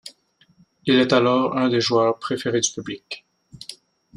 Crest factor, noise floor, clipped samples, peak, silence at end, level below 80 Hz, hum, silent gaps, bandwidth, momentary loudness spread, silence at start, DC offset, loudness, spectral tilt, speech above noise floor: 18 dB; -59 dBFS; under 0.1%; -4 dBFS; 0.4 s; -64 dBFS; none; none; 11.5 kHz; 21 LU; 0.05 s; under 0.1%; -20 LUFS; -4 dB/octave; 39 dB